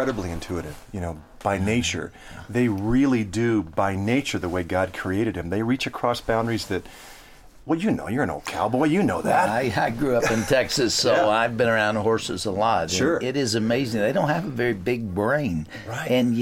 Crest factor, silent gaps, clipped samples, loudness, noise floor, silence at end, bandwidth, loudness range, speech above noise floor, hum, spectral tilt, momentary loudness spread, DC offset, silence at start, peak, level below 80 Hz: 16 dB; none; under 0.1%; -23 LUFS; -47 dBFS; 0 s; 16.5 kHz; 5 LU; 24 dB; none; -5 dB/octave; 10 LU; under 0.1%; 0 s; -8 dBFS; -46 dBFS